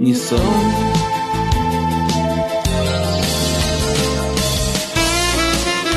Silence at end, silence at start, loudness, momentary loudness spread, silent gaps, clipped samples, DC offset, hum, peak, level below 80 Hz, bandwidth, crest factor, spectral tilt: 0 s; 0 s; -17 LUFS; 3 LU; none; under 0.1%; under 0.1%; none; -4 dBFS; -26 dBFS; 13.5 kHz; 14 dB; -4 dB/octave